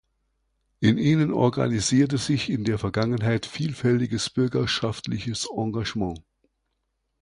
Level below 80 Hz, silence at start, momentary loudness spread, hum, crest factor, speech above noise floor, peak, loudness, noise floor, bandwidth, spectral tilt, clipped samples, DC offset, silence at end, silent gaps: -50 dBFS; 0.8 s; 8 LU; none; 18 dB; 52 dB; -6 dBFS; -24 LUFS; -76 dBFS; 11 kHz; -5.5 dB/octave; under 0.1%; under 0.1%; 1 s; none